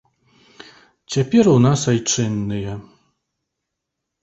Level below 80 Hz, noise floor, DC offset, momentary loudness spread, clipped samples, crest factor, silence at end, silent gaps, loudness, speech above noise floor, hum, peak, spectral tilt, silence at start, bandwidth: -50 dBFS; -80 dBFS; under 0.1%; 14 LU; under 0.1%; 18 dB; 1.4 s; none; -18 LUFS; 63 dB; none; -2 dBFS; -5.5 dB/octave; 1.1 s; 8.2 kHz